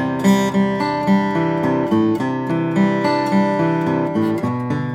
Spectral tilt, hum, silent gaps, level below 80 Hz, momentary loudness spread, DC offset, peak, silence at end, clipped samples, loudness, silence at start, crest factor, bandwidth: -7 dB/octave; none; none; -58 dBFS; 4 LU; under 0.1%; -4 dBFS; 0 s; under 0.1%; -18 LUFS; 0 s; 14 dB; 15 kHz